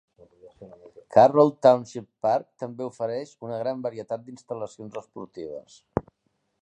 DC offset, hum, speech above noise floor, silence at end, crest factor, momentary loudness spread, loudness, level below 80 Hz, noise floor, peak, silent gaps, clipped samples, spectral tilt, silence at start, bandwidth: under 0.1%; none; 50 dB; 0.6 s; 22 dB; 21 LU; -24 LUFS; -60 dBFS; -74 dBFS; -4 dBFS; none; under 0.1%; -7 dB/octave; 0.45 s; 9 kHz